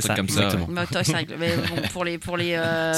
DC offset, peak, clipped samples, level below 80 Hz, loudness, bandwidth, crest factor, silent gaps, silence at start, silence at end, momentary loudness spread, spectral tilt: under 0.1%; -6 dBFS; under 0.1%; -48 dBFS; -24 LUFS; 17 kHz; 18 dB; none; 0 s; 0 s; 5 LU; -4 dB/octave